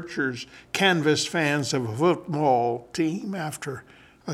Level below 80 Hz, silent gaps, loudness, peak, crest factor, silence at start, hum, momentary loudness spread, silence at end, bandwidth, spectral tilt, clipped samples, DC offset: -64 dBFS; none; -25 LUFS; -6 dBFS; 18 dB; 0 s; none; 13 LU; 0 s; 15.5 kHz; -4.5 dB/octave; under 0.1%; under 0.1%